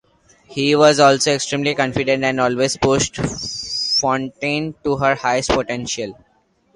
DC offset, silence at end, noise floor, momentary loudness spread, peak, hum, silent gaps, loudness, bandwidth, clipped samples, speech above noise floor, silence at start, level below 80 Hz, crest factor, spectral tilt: under 0.1%; 0.6 s; -50 dBFS; 10 LU; 0 dBFS; none; none; -18 LUFS; 11.5 kHz; under 0.1%; 32 dB; 0.5 s; -44 dBFS; 18 dB; -3.5 dB/octave